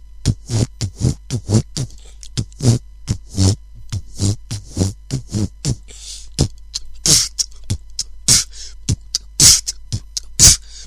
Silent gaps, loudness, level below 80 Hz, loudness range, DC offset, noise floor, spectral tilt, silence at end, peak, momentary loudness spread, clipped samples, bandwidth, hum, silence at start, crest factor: none; -16 LUFS; -32 dBFS; 8 LU; 0.4%; -35 dBFS; -2.5 dB/octave; 0 s; 0 dBFS; 19 LU; 0.1%; 14 kHz; none; 0.2 s; 18 dB